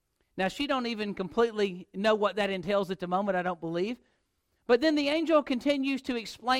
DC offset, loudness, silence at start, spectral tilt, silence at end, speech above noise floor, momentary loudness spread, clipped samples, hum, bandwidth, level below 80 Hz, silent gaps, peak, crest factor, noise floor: under 0.1%; -29 LUFS; 0.35 s; -5.5 dB/octave; 0 s; 47 dB; 8 LU; under 0.1%; none; 15.5 kHz; -62 dBFS; none; -12 dBFS; 18 dB; -76 dBFS